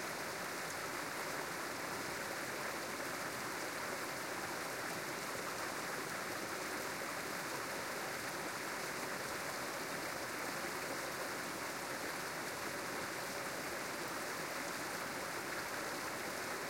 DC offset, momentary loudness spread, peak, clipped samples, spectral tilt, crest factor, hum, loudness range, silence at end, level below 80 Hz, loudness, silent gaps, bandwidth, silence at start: under 0.1%; 1 LU; -28 dBFS; under 0.1%; -2 dB/octave; 14 dB; none; 0 LU; 0 s; -74 dBFS; -41 LUFS; none; 16.5 kHz; 0 s